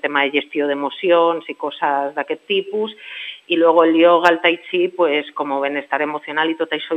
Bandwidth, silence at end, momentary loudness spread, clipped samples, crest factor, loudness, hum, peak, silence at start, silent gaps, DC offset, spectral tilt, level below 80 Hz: 8.4 kHz; 0 s; 12 LU; under 0.1%; 18 dB; -18 LUFS; none; 0 dBFS; 0.05 s; none; under 0.1%; -5 dB/octave; -76 dBFS